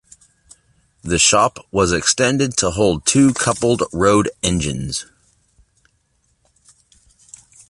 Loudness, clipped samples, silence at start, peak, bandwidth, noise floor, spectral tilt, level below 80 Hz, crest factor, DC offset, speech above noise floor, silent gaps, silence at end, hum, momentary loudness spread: -16 LUFS; under 0.1%; 1.05 s; 0 dBFS; 11.5 kHz; -64 dBFS; -3.5 dB/octave; -40 dBFS; 18 dB; under 0.1%; 47 dB; none; 2.65 s; none; 9 LU